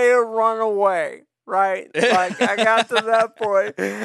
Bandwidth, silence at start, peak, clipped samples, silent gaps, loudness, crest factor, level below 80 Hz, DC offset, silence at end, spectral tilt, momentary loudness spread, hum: 13 kHz; 0 s; -2 dBFS; under 0.1%; none; -19 LUFS; 16 dB; -72 dBFS; under 0.1%; 0 s; -3.5 dB/octave; 6 LU; none